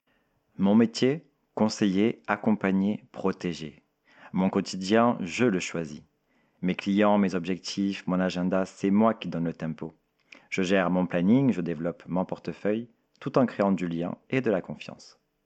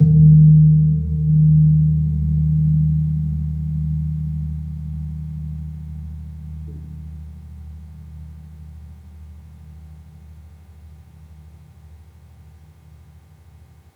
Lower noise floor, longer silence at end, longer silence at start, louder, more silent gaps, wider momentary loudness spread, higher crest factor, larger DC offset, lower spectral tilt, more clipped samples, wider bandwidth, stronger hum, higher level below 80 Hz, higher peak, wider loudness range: first, -71 dBFS vs -47 dBFS; second, 0.45 s vs 2.55 s; first, 0.6 s vs 0 s; second, -27 LUFS vs -17 LUFS; neither; second, 12 LU vs 27 LU; about the same, 20 dB vs 16 dB; neither; second, -6.5 dB/octave vs -12.5 dB/octave; neither; first, 8.6 kHz vs 0.8 kHz; neither; second, -66 dBFS vs -34 dBFS; second, -8 dBFS vs -2 dBFS; second, 2 LU vs 26 LU